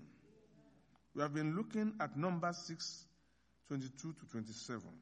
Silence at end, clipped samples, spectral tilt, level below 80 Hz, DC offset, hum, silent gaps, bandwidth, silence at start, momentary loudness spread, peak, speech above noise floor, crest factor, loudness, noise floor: 0 s; under 0.1%; -5.5 dB/octave; -80 dBFS; under 0.1%; none; none; 9.6 kHz; 0 s; 10 LU; -22 dBFS; 34 dB; 20 dB; -42 LUFS; -76 dBFS